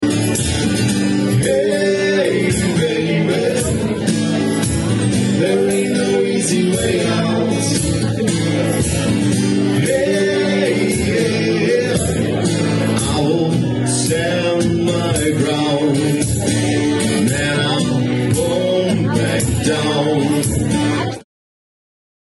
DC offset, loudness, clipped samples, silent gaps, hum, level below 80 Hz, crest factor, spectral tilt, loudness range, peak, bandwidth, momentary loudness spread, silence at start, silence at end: under 0.1%; -16 LUFS; under 0.1%; none; none; -38 dBFS; 14 dB; -5 dB/octave; 1 LU; -2 dBFS; 12.5 kHz; 2 LU; 0 s; 1.15 s